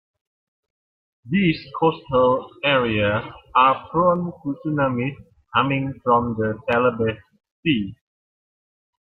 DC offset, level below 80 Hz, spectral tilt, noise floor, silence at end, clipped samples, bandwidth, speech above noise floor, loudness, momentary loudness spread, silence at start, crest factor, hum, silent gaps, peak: under 0.1%; -52 dBFS; -9 dB/octave; under -90 dBFS; 1.05 s; under 0.1%; 5.4 kHz; over 69 dB; -21 LUFS; 9 LU; 1.25 s; 18 dB; none; 7.51-7.63 s; -4 dBFS